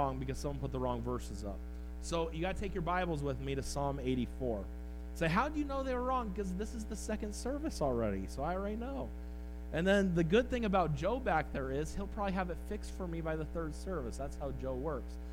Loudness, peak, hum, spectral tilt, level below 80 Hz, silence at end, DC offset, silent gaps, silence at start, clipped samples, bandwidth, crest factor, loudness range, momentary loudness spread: -37 LUFS; -16 dBFS; none; -6 dB/octave; -44 dBFS; 0 s; under 0.1%; none; 0 s; under 0.1%; 16 kHz; 20 dB; 5 LU; 11 LU